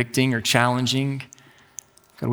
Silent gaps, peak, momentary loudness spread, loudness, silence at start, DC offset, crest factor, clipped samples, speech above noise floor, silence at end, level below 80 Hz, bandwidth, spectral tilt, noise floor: none; 0 dBFS; 22 LU; -21 LUFS; 0 s; under 0.1%; 24 dB; under 0.1%; 24 dB; 0 s; -64 dBFS; over 20 kHz; -4.5 dB/octave; -45 dBFS